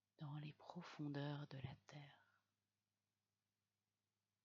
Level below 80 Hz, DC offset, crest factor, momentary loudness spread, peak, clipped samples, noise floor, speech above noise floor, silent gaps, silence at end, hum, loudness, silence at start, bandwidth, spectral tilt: -88 dBFS; under 0.1%; 20 dB; 13 LU; -36 dBFS; under 0.1%; under -90 dBFS; over 38 dB; none; 2.2 s; none; -54 LUFS; 0.2 s; 7.2 kHz; -6 dB/octave